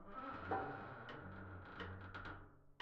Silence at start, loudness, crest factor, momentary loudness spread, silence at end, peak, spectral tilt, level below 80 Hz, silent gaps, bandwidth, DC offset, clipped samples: 0 s; -50 LUFS; 22 dB; 10 LU; 0 s; -28 dBFS; -7.5 dB/octave; -66 dBFS; none; 7.4 kHz; under 0.1%; under 0.1%